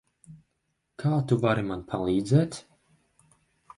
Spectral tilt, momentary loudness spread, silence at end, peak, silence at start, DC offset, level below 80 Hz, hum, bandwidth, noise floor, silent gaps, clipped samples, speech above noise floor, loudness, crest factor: -7.5 dB/octave; 9 LU; 1.15 s; -10 dBFS; 0.3 s; under 0.1%; -56 dBFS; none; 11.5 kHz; -77 dBFS; none; under 0.1%; 52 dB; -26 LUFS; 20 dB